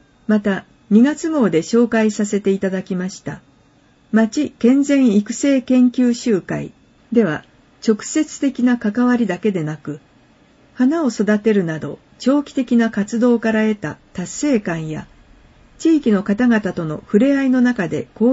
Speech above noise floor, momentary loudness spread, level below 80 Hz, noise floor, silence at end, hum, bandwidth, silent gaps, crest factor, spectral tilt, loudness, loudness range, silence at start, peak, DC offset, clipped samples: 37 dB; 12 LU; -54 dBFS; -53 dBFS; 0 s; none; 8 kHz; none; 16 dB; -6 dB/octave; -17 LUFS; 3 LU; 0.3 s; -2 dBFS; under 0.1%; under 0.1%